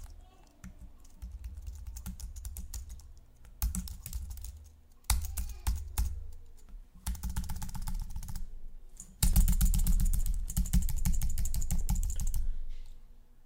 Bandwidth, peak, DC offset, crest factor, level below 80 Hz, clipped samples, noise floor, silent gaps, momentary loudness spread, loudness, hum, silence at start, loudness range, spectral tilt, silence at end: 16.5 kHz; -8 dBFS; under 0.1%; 24 dB; -34 dBFS; under 0.1%; -55 dBFS; none; 23 LU; -36 LUFS; none; 0 s; 10 LU; -4 dB/octave; 0.25 s